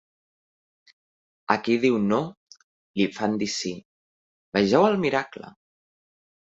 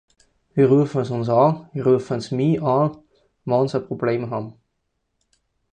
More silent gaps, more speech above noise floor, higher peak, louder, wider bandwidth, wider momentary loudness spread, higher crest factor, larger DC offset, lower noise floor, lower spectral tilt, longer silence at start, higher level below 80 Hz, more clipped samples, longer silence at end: first, 2.37-2.47 s, 2.64-2.94 s, 3.85-4.52 s vs none; first, over 67 dB vs 54 dB; about the same, -2 dBFS vs -4 dBFS; second, -24 LUFS vs -21 LUFS; second, 8 kHz vs 9.2 kHz; first, 17 LU vs 11 LU; first, 24 dB vs 18 dB; neither; first, under -90 dBFS vs -74 dBFS; second, -5 dB/octave vs -8.5 dB/octave; first, 1.5 s vs 0.55 s; about the same, -64 dBFS vs -60 dBFS; neither; second, 1.1 s vs 1.25 s